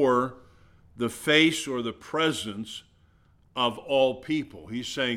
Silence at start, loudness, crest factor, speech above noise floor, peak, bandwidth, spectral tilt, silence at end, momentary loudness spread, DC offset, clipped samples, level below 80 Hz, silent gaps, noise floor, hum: 0 s; -26 LUFS; 22 dB; 34 dB; -6 dBFS; 16 kHz; -4 dB/octave; 0 s; 16 LU; under 0.1%; under 0.1%; -62 dBFS; none; -61 dBFS; none